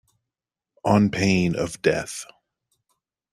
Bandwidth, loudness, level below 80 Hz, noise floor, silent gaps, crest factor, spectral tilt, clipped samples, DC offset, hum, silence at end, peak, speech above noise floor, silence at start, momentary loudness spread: 13.5 kHz; -22 LUFS; -54 dBFS; -88 dBFS; none; 20 dB; -5.5 dB/octave; under 0.1%; under 0.1%; none; 1.1 s; -4 dBFS; 67 dB; 0.85 s; 15 LU